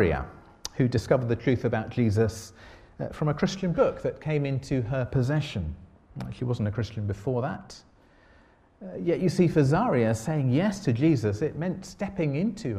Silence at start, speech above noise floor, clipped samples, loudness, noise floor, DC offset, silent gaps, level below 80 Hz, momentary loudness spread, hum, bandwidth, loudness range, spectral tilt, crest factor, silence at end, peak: 0 s; 32 dB; under 0.1%; -27 LUFS; -58 dBFS; under 0.1%; none; -48 dBFS; 15 LU; none; 14 kHz; 7 LU; -7.5 dB/octave; 20 dB; 0 s; -8 dBFS